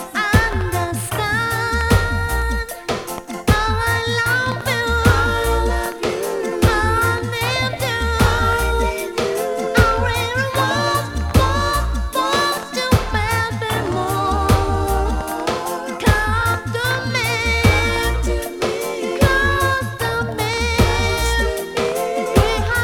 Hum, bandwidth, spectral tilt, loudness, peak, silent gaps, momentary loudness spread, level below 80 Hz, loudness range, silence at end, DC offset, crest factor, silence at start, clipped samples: none; 19 kHz; -4.5 dB/octave; -18 LUFS; 0 dBFS; none; 6 LU; -26 dBFS; 1 LU; 0 s; under 0.1%; 18 dB; 0 s; under 0.1%